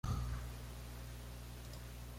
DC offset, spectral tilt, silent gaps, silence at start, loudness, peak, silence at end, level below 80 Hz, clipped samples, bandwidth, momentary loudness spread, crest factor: under 0.1%; -5.5 dB/octave; none; 0.05 s; -48 LUFS; -28 dBFS; 0 s; -48 dBFS; under 0.1%; 16.5 kHz; 8 LU; 16 dB